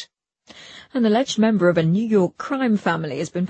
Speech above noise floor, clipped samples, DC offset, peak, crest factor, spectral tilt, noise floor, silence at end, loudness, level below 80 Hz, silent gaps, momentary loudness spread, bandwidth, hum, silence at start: 33 dB; under 0.1%; under 0.1%; -6 dBFS; 14 dB; -6.5 dB/octave; -52 dBFS; 0 s; -20 LUFS; -62 dBFS; none; 15 LU; 8.6 kHz; none; 0 s